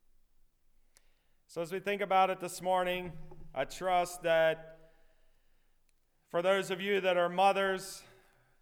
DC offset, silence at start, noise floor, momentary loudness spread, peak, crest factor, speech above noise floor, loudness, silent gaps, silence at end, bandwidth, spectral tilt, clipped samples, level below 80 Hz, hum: under 0.1%; 1.5 s; -71 dBFS; 14 LU; -16 dBFS; 18 dB; 39 dB; -32 LUFS; none; 0.6 s; 17.5 kHz; -4 dB/octave; under 0.1%; -60 dBFS; none